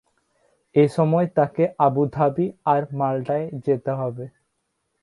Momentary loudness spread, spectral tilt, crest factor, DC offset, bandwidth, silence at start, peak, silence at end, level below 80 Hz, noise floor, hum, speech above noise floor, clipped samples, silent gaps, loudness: 7 LU; -9 dB/octave; 18 dB; under 0.1%; 11.5 kHz; 0.75 s; -4 dBFS; 0.75 s; -62 dBFS; -74 dBFS; none; 53 dB; under 0.1%; none; -22 LUFS